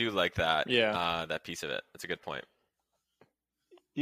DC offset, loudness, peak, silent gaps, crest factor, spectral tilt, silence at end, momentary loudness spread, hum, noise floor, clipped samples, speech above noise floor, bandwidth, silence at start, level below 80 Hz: under 0.1%; -31 LUFS; -10 dBFS; none; 24 dB; -4 dB/octave; 0 s; 14 LU; none; -82 dBFS; under 0.1%; 50 dB; 15.5 kHz; 0 s; -62 dBFS